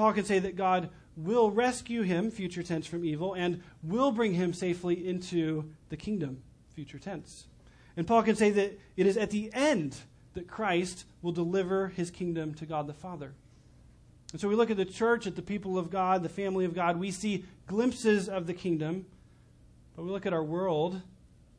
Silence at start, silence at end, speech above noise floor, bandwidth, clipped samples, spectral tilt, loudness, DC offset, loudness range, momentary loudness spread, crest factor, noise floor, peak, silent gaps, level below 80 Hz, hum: 0 s; 0.5 s; 28 dB; 10.5 kHz; under 0.1%; -6 dB/octave; -31 LUFS; under 0.1%; 5 LU; 16 LU; 18 dB; -58 dBFS; -12 dBFS; none; -60 dBFS; none